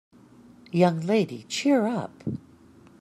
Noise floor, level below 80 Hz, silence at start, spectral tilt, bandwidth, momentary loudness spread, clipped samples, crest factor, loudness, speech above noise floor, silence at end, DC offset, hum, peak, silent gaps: -53 dBFS; -66 dBFS; 0.75 s; -6 dB/octave; 13 kHz; 13 LU; under 0.1%; 20 dB; -25 LUFS; 29 dB; 0.65 s; under 0.1%; none; -6 dBFS; none